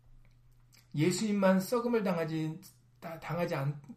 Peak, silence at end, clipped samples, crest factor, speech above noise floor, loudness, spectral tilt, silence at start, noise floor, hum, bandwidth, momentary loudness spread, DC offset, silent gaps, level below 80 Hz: -14 dBFS; 0 s; under 0.1%; 18 dB; 30 dB; -32 LUFS; -6 dB/octave; 0.95 s; -61 dBFS; none; 15.5 kHz; 16 LU; under 0.1%; none; -66 dBFS